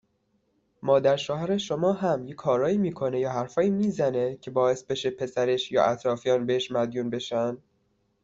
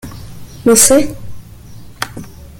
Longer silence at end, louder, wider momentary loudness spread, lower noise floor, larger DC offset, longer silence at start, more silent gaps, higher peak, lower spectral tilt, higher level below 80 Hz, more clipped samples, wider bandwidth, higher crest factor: first, 0.65 s vs 0.3 s; second, -26 LUFS vs -10 LUFS; second, 6 LU vs 26 LU; first, -71 dBFS vs -33 dBFS; neither; first, 0.85 s vs 0.05 s; neither; second, -8 dBFS vs 0 dBFS; first, -6 dB/octave vs -3 dB/octave; second, -64 dBFS vs -38 dBFS; second, under 0.1% vs 0.1%; second, 7.8 kHz vs 17 kHz; about the same, 18 dB vs 16 dB